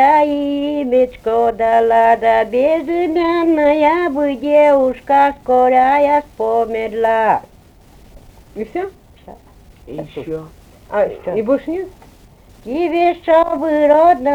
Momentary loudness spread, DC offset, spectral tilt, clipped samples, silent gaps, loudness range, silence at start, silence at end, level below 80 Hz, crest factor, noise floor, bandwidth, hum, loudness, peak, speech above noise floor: 14 LU; under 0.1%; -6.5 dB/octave; under 0.1%; none; 11 LU; 0 s; 0 s; -46 dBFS; 14 dB; -44 dBFS; 15.5 kHz; none; -15 LUFS; -2 dBFS; 30 dB